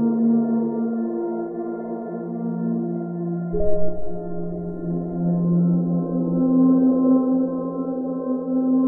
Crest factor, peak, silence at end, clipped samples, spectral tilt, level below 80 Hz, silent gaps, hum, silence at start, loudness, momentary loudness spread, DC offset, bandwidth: 14 dB; -6 dBFS; 0 s; under 0.1%; -15 dB/octave; -44 dBFS; none; none; 0 s; -22 LUFS; 12 LU; under 0.1%; 1.9 kHz